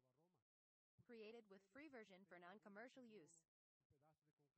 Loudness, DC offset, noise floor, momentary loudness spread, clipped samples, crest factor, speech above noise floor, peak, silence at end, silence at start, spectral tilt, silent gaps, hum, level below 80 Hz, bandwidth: -64 LUFS; under 0.1%; under -90 dBFS; 5 LU; under 0.1%; 18 dB; over 25 dB; -50 dBFS; 0.1 s; 0.05 s; -4.5 dB/octave; 0.42-0.98 s, 3.48-3.90 s, 4.33-4.37 s; none; under -90 dBFS; 8.2 kHz